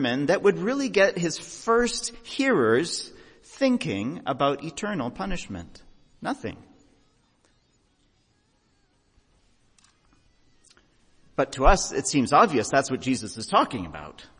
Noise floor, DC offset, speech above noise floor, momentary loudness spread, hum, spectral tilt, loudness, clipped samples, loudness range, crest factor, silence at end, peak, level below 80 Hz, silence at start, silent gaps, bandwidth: -67 dBFS; under 0.1%; 42 dB; 14 LU; none; -4 dB/octave; -24 LUFS; under 0.1%; 17 LU; 22 dB; 0.15 s; -4 dBFS; -38 dBFS; 0 s; none; 10.5 kHz